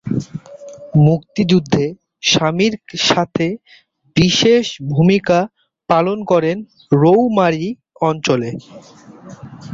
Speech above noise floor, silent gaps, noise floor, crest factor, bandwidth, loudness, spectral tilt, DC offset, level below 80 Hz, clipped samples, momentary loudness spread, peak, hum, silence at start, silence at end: 20 dB; none; -36 dBFS; 16 dB; 7.8 kHz; -15 LUFS; -5.5 dB/octave; under 0.1%; -48 dBFS; under 0.1%; 15 LU; -2 dBFS; none; 0.05 s; 0 s